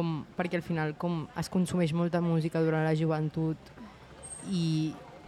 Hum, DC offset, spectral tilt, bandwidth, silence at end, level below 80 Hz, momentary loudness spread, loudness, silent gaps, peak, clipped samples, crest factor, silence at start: none; under 0.1%; -7 dB/octave; 12.5 kHz; 0 s; -60 dBFS; 14 LU; -31 LUFS; none; -16 dBFS; under 0.1%; 14 dB; 0 s